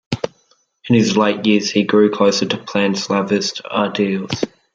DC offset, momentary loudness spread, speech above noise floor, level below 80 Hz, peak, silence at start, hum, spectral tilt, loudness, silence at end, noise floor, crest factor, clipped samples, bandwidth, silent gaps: under 0.1%; 10 LU; 43 dB; -56 dBFS; -2 dBFS; 0.1 s; none; -5 dB/octave; -17 LUFS; 0.25 s; -59 dBFS; 16 dB; under 0.1%; 7.8 kHz; none